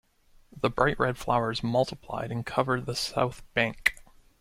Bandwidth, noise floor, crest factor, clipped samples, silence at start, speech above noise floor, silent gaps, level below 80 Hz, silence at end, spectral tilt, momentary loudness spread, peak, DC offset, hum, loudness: 16.5 kHz; -52 dBFS; 24 dB; under 0.1%; 0.55 s; 23 dB; none; -50 dBFS; 0.4 s; -5 dB/octave; 6 LU; -6 dBFS; under 0.1%; none; -28 LUFS